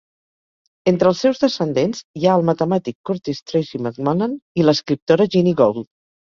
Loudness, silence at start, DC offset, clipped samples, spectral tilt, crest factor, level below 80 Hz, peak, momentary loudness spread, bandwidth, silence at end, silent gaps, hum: -18 LUFS; 0.85 s; under 0.1%; under 0.1%; -6.5 dB/octave; 18 dB; -58 dBFS; -2 dBFS; 9 LU; 7.4 kHz; 0.35 s; 2.04-2.14 s, 2.95-3.04 s, 3.42-3.46 s, 4.42-4.55 s, 5.02-5.07 s; none